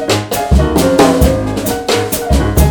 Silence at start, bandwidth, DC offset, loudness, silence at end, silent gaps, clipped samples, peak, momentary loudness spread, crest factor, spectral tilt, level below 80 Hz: 0 s; 19.5 kHz; under 0.1%; -12 LUFS; 0 s; none; 0.1%; 0 dBFS; 6 LU; 12 dB; -5.5 dB/octave; -18 dBFS